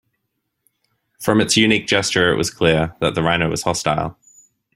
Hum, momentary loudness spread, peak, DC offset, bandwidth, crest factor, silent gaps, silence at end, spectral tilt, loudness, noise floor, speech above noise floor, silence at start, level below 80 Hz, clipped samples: none; 7 LU; -2 dBFS; under 0.1%; 16 kHz; 18 dB; none; 0.65 s; -4 dB/octave; -17 LUFS; -74 dBFS; 57 dB; 1.2 s; -46 dBFS; under 0.1%